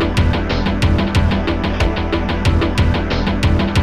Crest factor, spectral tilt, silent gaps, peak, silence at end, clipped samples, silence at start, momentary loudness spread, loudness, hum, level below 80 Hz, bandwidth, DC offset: 12 dB; -6.5 dB/octave; none; -4 dBFS; 0 s; under 0.1%; 0 s; 3 LU; -17 LUFS; none; -22 dBFS; 12.5 kHz; 2%